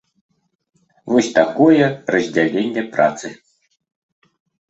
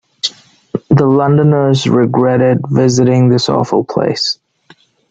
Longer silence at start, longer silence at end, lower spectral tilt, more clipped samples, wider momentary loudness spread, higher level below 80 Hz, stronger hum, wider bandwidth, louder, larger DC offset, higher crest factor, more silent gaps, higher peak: first, 1.05 s vs 0.25 s; first, 1.35 s vs 0.8 s; about the same, -5.5 dB/octave vs -6.5 dB/octave; neither; about the same, 8 LU vs 10 LU; second, -60 dBFS vs -50 dBFS; neither; about the same, 8.2 kHz vs 7.8 kHz; second, -16 LUFS vs -12 LUFS; neither; first, 18 dB vs 12 dB; neither; about the same, 0 dBFS vs 0 dBFS